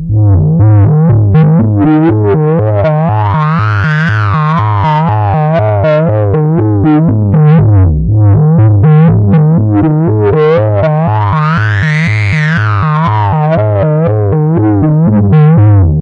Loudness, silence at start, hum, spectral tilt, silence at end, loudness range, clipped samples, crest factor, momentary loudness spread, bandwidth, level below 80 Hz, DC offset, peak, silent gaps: -8 LUFS; 0 s; none; -10 dB/octave; 0 s; 3 LU; under 0.1%; 6 dB; 4 LU; 5.4 kHz; -28 dBFS; under 0.1%; 0 dBFS; none